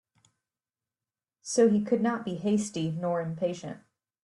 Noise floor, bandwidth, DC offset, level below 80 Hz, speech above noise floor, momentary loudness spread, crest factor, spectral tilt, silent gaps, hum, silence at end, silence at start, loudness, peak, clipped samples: under -90 dBFS; 11.5 kHz; under 0.1%; -72 dBFS; over 63 dB; 17 LU; 18 dB; -6 dB/octave; none; none; 0.45 s; 1.45 s; -28 LUFS; -12 dBFS; under 0.1%